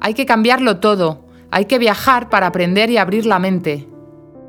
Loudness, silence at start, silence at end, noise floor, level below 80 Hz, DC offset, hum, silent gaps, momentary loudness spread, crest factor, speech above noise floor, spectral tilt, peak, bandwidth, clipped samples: -14 LUFS; 0 s; 0 s; -39 dBFS; -50 dBFS; under 0.1%; none; none; 8 LU; 16 dB; 25 dB; -5.5 dB/octave; 0 dBFS; 19.5 kHz; under 0.1%